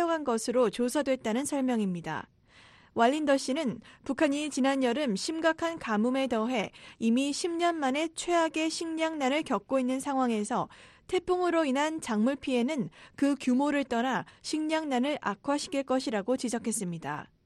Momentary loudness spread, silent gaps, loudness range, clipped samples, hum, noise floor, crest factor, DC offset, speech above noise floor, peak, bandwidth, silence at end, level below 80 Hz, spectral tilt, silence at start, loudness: 7 LU; none; 1 LU; under 0.1%; none; -58 dBFS; 18 dB; under 0.1%; 29 dB; -12 dBFS; 12.5 kHz; 0.2 s; -66 dBFS; -4 dB/octave; 0 s; -29 LUFS